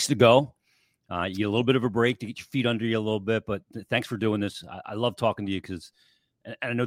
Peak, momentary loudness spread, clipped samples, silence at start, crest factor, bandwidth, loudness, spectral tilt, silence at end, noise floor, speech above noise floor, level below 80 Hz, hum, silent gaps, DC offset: -4 dBFS; 14 LU; under 0.1%; 0 s; 22 dB; 16.5 kHz; -26 LUFS; -5.5 dB/octave; 0 s; -69 dBFS; 43 dB; -62 dBFS; none; none; under 0.1%